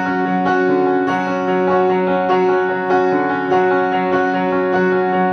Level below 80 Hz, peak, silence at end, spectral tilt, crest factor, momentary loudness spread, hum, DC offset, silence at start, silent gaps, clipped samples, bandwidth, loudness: -60 dBFS; -4 dBFS; 0 s; -7.5 dB/octave; 12 dB; 2 LU; none; under 0.1%; 0 s; none; under 0.1%; 6.6 kHz; -16 LUFS